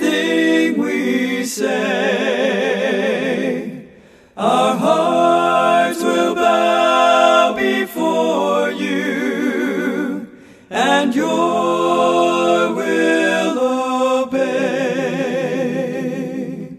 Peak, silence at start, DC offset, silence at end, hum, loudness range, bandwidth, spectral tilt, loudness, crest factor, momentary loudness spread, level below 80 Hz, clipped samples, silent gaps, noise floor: -2 dBFS; 0 s; under 0.1%; 0 s; none; 4 LU; 14 kHz; -4.5 dB/octave; -16 LUFS; 16 dB; 8 LU; -62 dBFS; under 0.1%; none; -45 dBFS